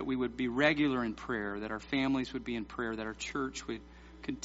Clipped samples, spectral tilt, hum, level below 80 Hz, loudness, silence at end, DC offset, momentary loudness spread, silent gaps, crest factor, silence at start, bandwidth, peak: under 0.1%; -3.5 dB/octave; none; -56 dBFS; -34 LUFS; 0 s; under 0.1%; 13 LU; none; 22 dB; 0 s; 7.6 kHz; -12 dBFS